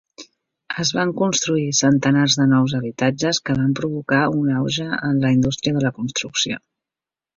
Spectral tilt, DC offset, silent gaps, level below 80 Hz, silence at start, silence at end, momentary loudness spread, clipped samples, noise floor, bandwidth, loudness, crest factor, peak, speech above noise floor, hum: -4.5 dB/octave; under 0.1%; none; -52 dBFS; 0.2 s; 0.8 s; 6 LU; under 0.1%; -89 dBFS; 7.6 kHz; -19 LUFS; 18 dB; -2 dBFS; 70 dB; none